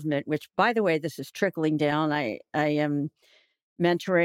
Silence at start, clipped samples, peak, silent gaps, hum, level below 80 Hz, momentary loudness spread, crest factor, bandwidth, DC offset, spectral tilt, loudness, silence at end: 0 s; under 0.1%; -8 dBFS; 3.62-3.76 s; none; -74 dBFS; 7 LU; 18 dB; 16 kHz; under 0.1%; -6.5 dB/octave; -27 LUFS; 0 s